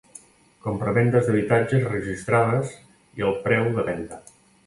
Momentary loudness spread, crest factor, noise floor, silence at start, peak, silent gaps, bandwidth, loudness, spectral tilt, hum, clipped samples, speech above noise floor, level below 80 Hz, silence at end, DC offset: 14 LU; 18 dB; -50 dBFS; 0.65 s; -4 dBFS; none; 11.5 kHz; -23 LUFS; -7.5 dB/octave; none; under 0.1%; 27 dB; -52 dBFS; 0.45 s; under 0.1%